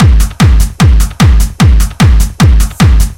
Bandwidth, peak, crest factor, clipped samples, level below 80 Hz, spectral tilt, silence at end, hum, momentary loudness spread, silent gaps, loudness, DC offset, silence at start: 16.5 kHz; 0 dBFS; 6 dB; 1%; -8 dBFS; -5.5 dB/octave; 0.05 s; none; 0 LU; none; -8 LUFS; under 0.1%; 0 s